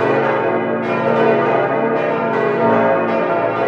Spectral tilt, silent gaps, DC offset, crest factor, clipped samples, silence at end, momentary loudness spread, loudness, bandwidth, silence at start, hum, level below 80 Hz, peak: -8 dB/octave; none; under 0.1%; 14 dB; under 0.1%; 0 s; 4 LU; -16 LUFS; 7 kHz; 0 s; none; -62 dBFS; -2 dBFS